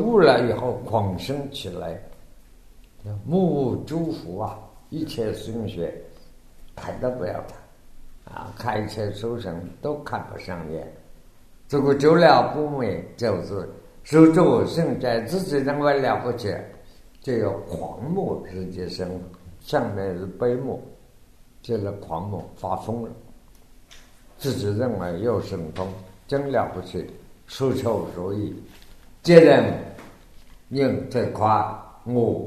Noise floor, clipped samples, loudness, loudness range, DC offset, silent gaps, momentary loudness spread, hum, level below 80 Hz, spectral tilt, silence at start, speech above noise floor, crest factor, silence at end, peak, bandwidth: -50 dBFS; under 0.1%; -23 LUFS; 12 LU; under 0.1%; none; 20 LU; none; -50 dBFS; -7 dB/octave; 0 s; 28 dB; 24 dB; 0 s; 0 dBFS; 13.5 kHz